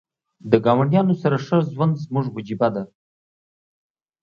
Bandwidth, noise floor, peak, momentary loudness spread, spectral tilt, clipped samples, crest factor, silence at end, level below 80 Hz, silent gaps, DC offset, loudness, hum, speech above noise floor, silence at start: 7 kHz; under -90 dBFS; 0 dBFS; 12 LU; -9 dB/octave; under 0.1%; 20 dB; 1.35 s; -62 dBFS; none; under 0.1%; -20 LUFS; none; over 71 dB; 0.45 s